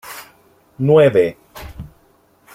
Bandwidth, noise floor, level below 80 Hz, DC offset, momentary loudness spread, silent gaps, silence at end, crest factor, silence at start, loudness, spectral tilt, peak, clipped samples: 16 kHz; -55 dBFS; -46 dBFS; under 0.1%; 25 LU; none; 0.7 s; 16 dB; 0.05 s; -14 LUFS; -7 dB/octave; -2 dBFS; under 0.1%